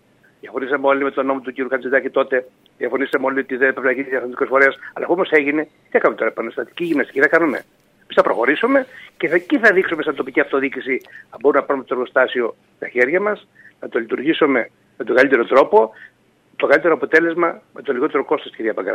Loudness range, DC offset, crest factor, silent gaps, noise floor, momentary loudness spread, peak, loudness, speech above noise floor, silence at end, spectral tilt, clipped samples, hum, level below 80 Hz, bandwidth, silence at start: 3 LU; under 0.1%; 18 dB; none; -43 dBFS; 11 LU; 0 dBFS; -18 LUFS; 25 dB; 0 s; -6 dB/octave; under 0.1%; none; -68 dBFS; 10 kHz; 0.45 s